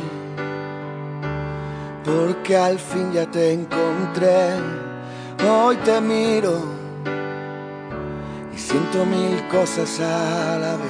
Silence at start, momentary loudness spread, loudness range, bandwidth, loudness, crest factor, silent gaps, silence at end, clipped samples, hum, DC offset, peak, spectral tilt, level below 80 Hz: 0 s; 14 LU; 4 LU; 10 kHz; -22 LUFS; 16 dB; none; 0 s; under 0.1%; none; under 0.1%; -4 dBFS; -5.5 dB/octave; -52 dBFS